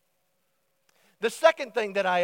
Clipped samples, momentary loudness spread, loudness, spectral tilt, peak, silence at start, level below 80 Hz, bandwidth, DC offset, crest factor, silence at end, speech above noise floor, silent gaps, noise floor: under 0.1%; 9 LU; -25 LUFS; -3 dB/octave; -6 dBFS; 1.2 s; under -90 dBFS; 16.5 kHz; under 0.1%; 22 dB; 0 s; 50 dB; none; -75 dBFS